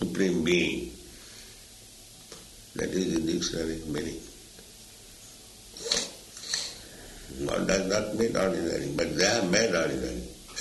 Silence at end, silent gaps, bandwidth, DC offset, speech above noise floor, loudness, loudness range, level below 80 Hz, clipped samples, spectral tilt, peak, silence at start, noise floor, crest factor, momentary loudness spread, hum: 0 s; none; 12 kHz; under 0.1%; 22 dB; -28 LUFS; 7 LU; -50 dBFS; under 0.1%; -3.5 dB/octave; -8 dBFS; 0 s; -50 dBFS; 22 dB; 23 LU; none